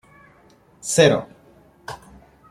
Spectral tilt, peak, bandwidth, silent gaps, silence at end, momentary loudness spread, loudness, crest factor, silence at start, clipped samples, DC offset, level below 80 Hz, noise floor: -4 dB/octave; -2 dBFS; 15.5 kHz; none; 0.55 s; 25 LU; -18 LUFS; 22 dB; 0.85 s; under 0.1%; under 0.1%; -56 dBFS; -54 dBFS